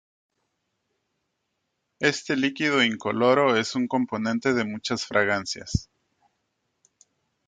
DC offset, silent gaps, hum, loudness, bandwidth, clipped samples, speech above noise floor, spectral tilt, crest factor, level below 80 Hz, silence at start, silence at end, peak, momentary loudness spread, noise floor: under 0.1%; none; none; -24 LUFS; 9.4 kHz; under 0.1%; 54 dB; -4.5 dB/octave; 20 dB; -50 dBFS; 2 s; 1.65 s; -6 dBFS; 8 LU; -78 dBFS